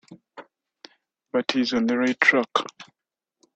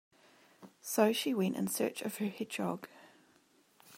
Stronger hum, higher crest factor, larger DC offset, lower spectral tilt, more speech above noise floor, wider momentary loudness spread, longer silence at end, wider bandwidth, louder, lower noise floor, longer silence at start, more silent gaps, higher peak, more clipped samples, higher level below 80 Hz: neither; about the same, 24 dB vs 22 dB; neither; about the same, -3.5 dB/octave vs -4.5 dB/octave; first, 64 dB vs 35 dB; second, 10 LU vs 13 LU; first, 0.7 s vs 0 s; second, 8.2 kHz vs 16 kHz; first, -22 LUFS vs -34 LUFS; first, -86 dBFS vs -68 dBFS; second, 0.1 s vs 0.6 s; neither; first, -2 dBFS vs -14 dBFS; neither; first, -68 dBFS vs -84 dBFS